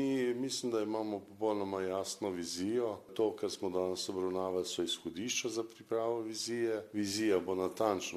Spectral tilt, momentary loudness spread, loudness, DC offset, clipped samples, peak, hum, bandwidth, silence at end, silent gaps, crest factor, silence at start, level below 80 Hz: -3.5 dB/octave; 5 LU; -36 LUFS; under 0.1%; under 0.1%; -16 dBFS; none; 14 kHz; 0 s; none; 18 dB; 0 s; -76 dBFS